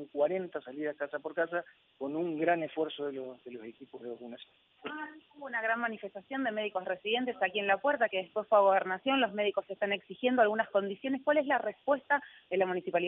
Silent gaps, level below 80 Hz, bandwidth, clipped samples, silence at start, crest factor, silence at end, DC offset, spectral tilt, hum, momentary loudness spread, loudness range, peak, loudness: none; -82 dBFS; 3.9 kHz; under 0.1%; 0 s; 18 dB; 0 s; under 0.1%; -8 dB/octave; none; 17 LU; 9 LU; -14 dBFS; -32 LUFS